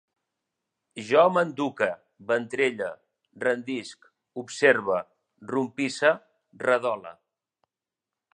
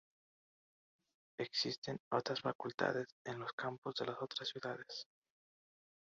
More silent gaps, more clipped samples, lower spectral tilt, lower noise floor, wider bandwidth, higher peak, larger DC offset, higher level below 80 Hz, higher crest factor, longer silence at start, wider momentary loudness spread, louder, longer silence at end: second, none vs 1.78-1.82 s, 2.00-2.11 s, 2.55-2.59 s, 2.74-2.78 s, 3.12-3.25 s, 3.53-3.58 s, 3.78-3.82 s; neither; first, -4.5 dB/octave vs -2.5 dB/octave; about the same, -89 dBFS vs under -90 dBFS; first, 10 kHz vs 7.6 kHz; first, -4 dBFS vs -20 dBFS; neither; about the same, -78 dBFS vs -82 dBFS; about the same, 22 dB vs 24 dB; second, 0.95 s vs 1.4 s; first, 20 LU vs 9 LU; first, -26 LUFS vs -42 LUFS; first, 1.25 s vs 1.1 s